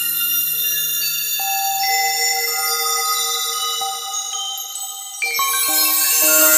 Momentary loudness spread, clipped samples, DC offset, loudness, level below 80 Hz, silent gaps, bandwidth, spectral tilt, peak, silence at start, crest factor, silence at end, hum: 10 LU; under 0.1%; under 0.1%; -17 LUFS; -72 dBFS; none; 16 kHz; 2 dB/octave; 0 dBFS; 0 s; 18 dB; 0 s; none